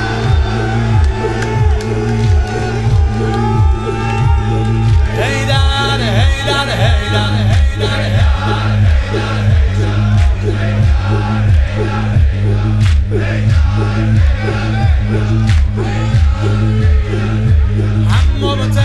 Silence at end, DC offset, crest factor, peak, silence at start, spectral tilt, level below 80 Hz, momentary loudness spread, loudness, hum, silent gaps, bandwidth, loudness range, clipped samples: 0 s; under 0.1%; 12 dB; 0 dBFS; 0 s; -6.5 dB/octave; -16 dBFS; 3 LU; -13 LUFS; none; none; 11 kHz; 1 LU; under 0.1%